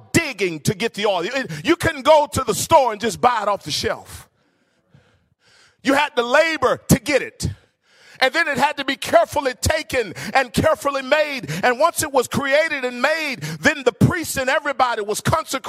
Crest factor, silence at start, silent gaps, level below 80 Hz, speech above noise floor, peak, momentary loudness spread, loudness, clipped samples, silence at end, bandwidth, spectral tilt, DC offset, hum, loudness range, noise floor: 18 dB; 0.15 s; none; -44 dBFS; 44 dB; -2 dBFS; 7 LU; -19 LUFS; under 0.1%; 0 s; 16 kHz; -4 dB/octave; under 0.1%; none; 3 LU; -63 dBFS